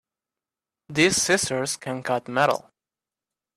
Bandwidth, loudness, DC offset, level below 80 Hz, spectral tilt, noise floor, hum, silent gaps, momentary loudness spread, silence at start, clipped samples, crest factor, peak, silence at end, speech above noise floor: 15 kHz; -23 LUFS; under 0.1%; -60 dBFS; -3 dB/octave; under -90 dBFS; none; none; 10 LU; 0.9 s; under 0.1%; 20 dB; -6 dBFS; 1 s; over 67 dB